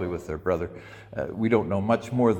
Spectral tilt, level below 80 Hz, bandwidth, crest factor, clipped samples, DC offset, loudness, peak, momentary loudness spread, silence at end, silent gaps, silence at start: -8 dB/octave; -52 dBFS; 10 kHz; 18 dB; under 0.1%; under 0.1%; -27 LUFS; -8 dBFS; 13 LU; 0 s; none; 0 s